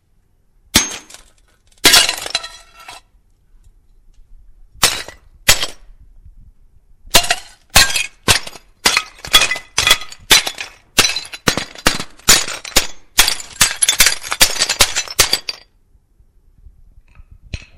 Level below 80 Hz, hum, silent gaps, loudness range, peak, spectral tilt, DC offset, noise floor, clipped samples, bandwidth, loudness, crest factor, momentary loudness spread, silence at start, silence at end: -34 dBFS; none; none; 7 LU; 0 dBFS; 0 dB/octave; under 0.1%; -56 dBFS; 0.2%; over 20 kHz; -13 LUFS; 18 dB; 12 LU; 0.75 s; 0.2 s